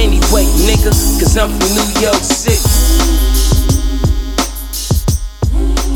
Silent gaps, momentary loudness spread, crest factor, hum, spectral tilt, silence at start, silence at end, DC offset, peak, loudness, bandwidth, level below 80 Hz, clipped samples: none; 6 LU; 10 dB; none; -4 dB/octave; 0 s; 0 s; under 0.1%; 0 dBFS; -13 LUFS; 20 kHz; -14 dBFS; under 0.1%